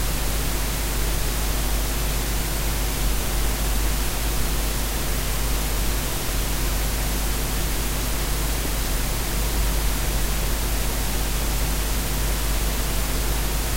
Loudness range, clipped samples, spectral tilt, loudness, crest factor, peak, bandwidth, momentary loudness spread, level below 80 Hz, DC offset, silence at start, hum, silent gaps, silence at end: 0 LU; under 0.1%; -3.5 dB/octave; -25 LUFS; 12 dB; -10 dBFS; 16 kHz; 1 LU; -24 dBFS; under 0.1%; 0 s; none; none; 0 s